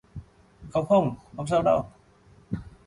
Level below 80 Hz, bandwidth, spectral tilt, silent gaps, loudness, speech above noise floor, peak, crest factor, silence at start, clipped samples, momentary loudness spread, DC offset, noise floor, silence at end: -52 dBFS; 11 kHz; -7.5 dB/octave; none; -26 LUFS; 32 dB; -10 dBFS; 18 dB; 0.15 s; under 0.1%; 20 LU; under 0.1%; -56 dBFS; 0.2 s